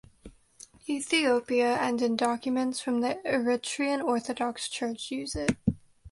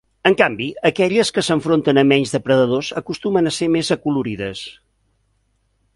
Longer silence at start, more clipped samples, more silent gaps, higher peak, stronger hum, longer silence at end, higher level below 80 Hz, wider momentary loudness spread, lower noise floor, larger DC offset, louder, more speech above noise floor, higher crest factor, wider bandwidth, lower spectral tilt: about the same, 0.25 s vs 0.25 s; neither; neither; second, -10 dBFS vs 0 dBFS; neither; second, 0 s vs 1.25 s; about the same, -54 dBFS vs -54 dBFS; about the same, 8 LU vs 10 LU; second, -54 dBFS vs -65 dBFS; neither; second, -29 LUFS vs -18 LUFS; second, 26 dB vs 47 dB; about the same, 20 dB vs 18 dB; about the same, 11.5 kHz vs 11.5 kHz; about the same, -4 dB/octave vs -5 dB/octave